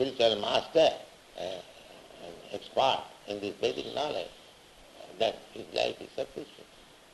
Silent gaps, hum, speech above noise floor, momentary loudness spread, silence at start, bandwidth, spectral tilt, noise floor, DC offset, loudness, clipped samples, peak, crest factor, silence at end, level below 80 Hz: none; none; 24 dB; 23 LU; 0 s; 12 kHz; -3.5 dB/octave; -55 dBFS; under 0.1%; -31 LUFS; under 0.1%; -12 dBFS; 20 dB; 0.5 s; -66 dBFS